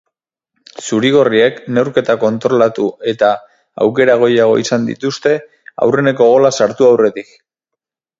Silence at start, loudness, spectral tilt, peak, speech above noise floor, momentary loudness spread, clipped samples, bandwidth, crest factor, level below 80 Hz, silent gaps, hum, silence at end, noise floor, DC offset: 0.8 s; -13 LUFS; -5 dB/octave; 0 dBFS; 68 dB; 8 LU; under 0.1%; 7.8 kHz; 14 dB; -58 dBFS; none; none; 1 s; -80 dBFS; under 0.1%